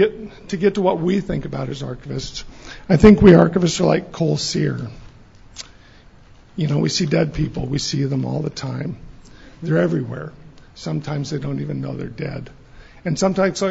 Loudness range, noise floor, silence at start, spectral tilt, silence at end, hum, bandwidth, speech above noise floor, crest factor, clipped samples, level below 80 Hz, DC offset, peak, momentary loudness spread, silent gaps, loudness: 9 LU; -46 dBFS; 0 s; -6.5 dB/octave; 0 s; none; 8 kHz; 28 dB; 18 dB; under 0.1%; -38 dBFS; under 0.1%; 0 dBFS; 21 LU; none; -19 LUFS